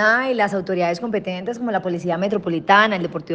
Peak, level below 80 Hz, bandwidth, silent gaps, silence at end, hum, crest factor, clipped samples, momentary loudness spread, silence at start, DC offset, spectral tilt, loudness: -2 dBFS; -62 dBFS; 9 kHz; none; 0 s; none; 18 dB; under 0.1%; 10 LU; 0 s; under 0.1%; -5.5 dB/octave; -20 LUFS